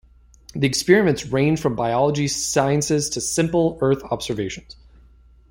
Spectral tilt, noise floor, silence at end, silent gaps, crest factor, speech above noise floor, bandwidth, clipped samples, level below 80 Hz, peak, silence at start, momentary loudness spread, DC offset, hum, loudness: -4.5 dB/octave; -50 dBFS; 0.8 s; none; 18 dB; 30 dB; 16.5 kHz; under 0.1%; -48 dBFS; -2 dBFS; 0.55 s; 10 LU; under 0.1%; none; -20 LUFS